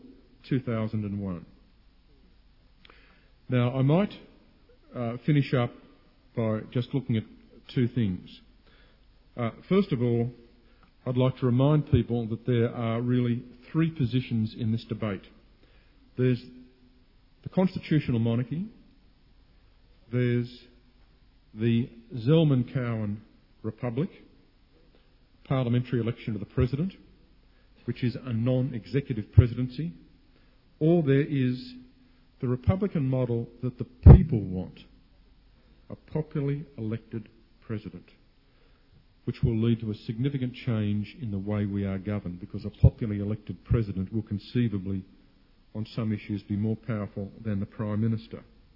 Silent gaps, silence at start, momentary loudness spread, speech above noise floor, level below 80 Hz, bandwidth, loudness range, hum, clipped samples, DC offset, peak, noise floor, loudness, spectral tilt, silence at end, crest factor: none; 0.05 s; 14 LU; 34 dB; -40 dBFS; 5.6 kHz; 9 LU; none; under 0.1%; under 0.1%; -4 dBFS; -60 dBFS; -28 LUFS; -11 dB/octave; 0.35 s; 24 dB